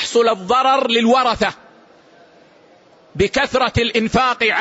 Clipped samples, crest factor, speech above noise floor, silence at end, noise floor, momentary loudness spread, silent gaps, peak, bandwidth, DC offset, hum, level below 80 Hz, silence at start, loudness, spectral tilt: under 0.1%; 14 dB; 33 dB; 0 s; -49 dBFS; 6 LU; none; -4 dBFS; 8 kHz; under 0.1%; none; -42 dBFS; 0 s; -16 LUFS; -4 dB/octave